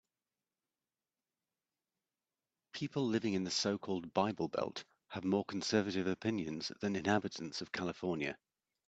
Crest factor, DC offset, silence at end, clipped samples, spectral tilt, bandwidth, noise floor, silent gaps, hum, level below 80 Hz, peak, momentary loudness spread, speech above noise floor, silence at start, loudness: 22 dB; under 0.1%; 0.55 s; under 0.1%; -5 dB/octave; 8.6 kHz; under -90 dBFS; none; none; -76 dBFS; -16 dBFS; 8 LU; over 53 dB; 2.75 s; -37 LUFS